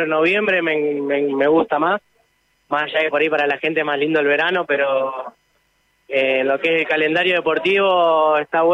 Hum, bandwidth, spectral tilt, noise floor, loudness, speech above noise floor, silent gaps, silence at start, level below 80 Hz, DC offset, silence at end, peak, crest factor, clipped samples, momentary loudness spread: none; 8.2 kHz; -6 dB/octave; -63 dBFS; -18 LUFS; 46 dB; none; 0 s; -66 dBFS; under 0.1%; 0 s; -6 dBFS; 12 dB; under 0.1%; 6 LU